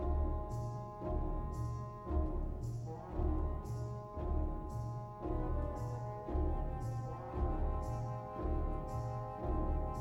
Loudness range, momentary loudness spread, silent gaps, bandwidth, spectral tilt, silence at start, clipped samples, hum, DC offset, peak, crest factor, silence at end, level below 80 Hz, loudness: 1 LU; 5 LU; none; 11 kHz; -9 dB/octave; 0 s; under 0.1%; none; under 0.1%; -24 dBFS; 14 dB; 0 s; -40 dBFS; -41 LUFS